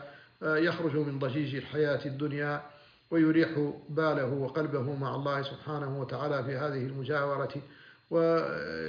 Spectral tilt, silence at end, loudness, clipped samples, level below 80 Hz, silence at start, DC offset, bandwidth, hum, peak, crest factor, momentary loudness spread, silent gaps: -6 dB/octave; 0 s; -31 LUFS; under 0.1%; -70 dBFS; 0 s; under 0.1%; 5.2 kHz; none; -16 dBFS; 16 dB; 8 LU; none